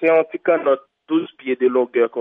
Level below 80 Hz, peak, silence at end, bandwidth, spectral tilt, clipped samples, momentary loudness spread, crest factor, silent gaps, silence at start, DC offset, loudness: -74 dBFS; -4 dBFS; 0 s; 3.8 kHz; -8 dB/octave; under 0.1%; 5 LU; 14 dB; none; 0 s; under 0.1%; -19 LUFS